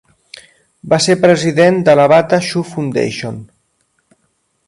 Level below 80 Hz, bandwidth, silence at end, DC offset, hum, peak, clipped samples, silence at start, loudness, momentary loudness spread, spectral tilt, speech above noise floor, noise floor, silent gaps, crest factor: -54 dBFS; 11.5 kHz; 1.2 s; under 0.1%; none; 0 dBFS; under 0.1%; 0.85 s; -12 LUFS; 12 LU; -5 dB/octave; 52 dB; -63 dBFS; none; 14 dB